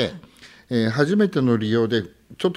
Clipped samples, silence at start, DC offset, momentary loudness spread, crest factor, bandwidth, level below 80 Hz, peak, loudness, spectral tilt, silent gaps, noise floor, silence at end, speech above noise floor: under 0.1%; 0 s; under 0.1%; 9 LU; 18 dB; 12 kHz; -58 dBFS; -4 dBFS; -21 LUFS; -7 dB/octave; none; -48 dBFS; 0 s; 27 dB